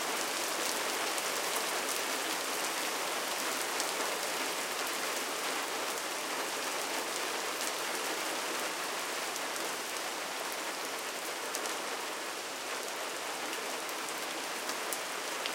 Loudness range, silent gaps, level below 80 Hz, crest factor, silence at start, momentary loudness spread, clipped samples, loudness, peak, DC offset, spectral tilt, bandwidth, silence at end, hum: 4 LU; none; -84 dBFS; 26 dB; 0 s; 4 LU; under 0.1%; -34 LUFS; -10 dBFS; under 0.1%; 0 dB/octave; 17 kHz; 0 s; none